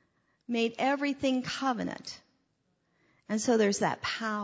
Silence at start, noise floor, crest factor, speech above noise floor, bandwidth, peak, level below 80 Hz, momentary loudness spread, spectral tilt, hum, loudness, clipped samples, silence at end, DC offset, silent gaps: 0.5 s; -75 dBFS; 18 dB; 46 dB; 8 kHz; -14 dBFS; -68 dBFS; 11 LU; -4 dB/octave; none; -30 LUFS; under 0.1%; 0 s; under 0.1%; none